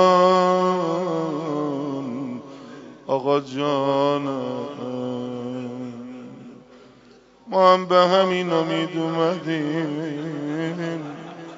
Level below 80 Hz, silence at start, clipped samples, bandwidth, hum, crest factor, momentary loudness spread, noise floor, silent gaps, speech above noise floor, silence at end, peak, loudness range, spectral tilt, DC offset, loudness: -70 dBFS; 0 s; under 0.1%; 7.6 kHz; none; 20 dB; 19 LU; -51 dBFS; none; 30 dB; 0 s; -2 dBFS; 6 LU; -4.5 dB/octave; under 0.1%; -22 LUFS